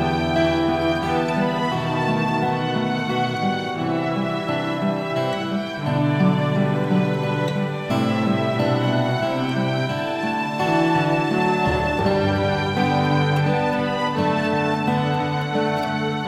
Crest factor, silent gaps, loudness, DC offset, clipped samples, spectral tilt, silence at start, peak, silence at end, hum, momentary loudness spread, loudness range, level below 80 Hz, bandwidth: 14 dB; none; -21 LUFS; under 0.1%; under 0.1%; -7 dB/octave; 0 s; -6 dBFS; 0 s; none; 4 LU; 2 LU; -48 dBFS; 13.5 kHz